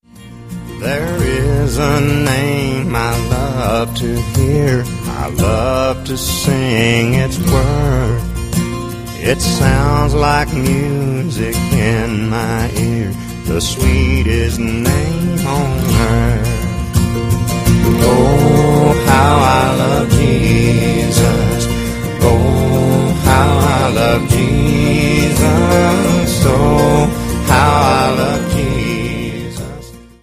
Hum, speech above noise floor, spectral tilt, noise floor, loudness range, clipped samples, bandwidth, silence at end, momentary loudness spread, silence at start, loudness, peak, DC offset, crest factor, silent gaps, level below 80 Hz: none; 22 dB; -5.5 dB/octave; -34 dBFS; 4 LU; under 0.1%; 15.5 kHz; 0.2 s; 8 LU; 0.15 s; -14 LUFS; 0 dBFS; under 0.1%; 12 dB; none; -24 dBFS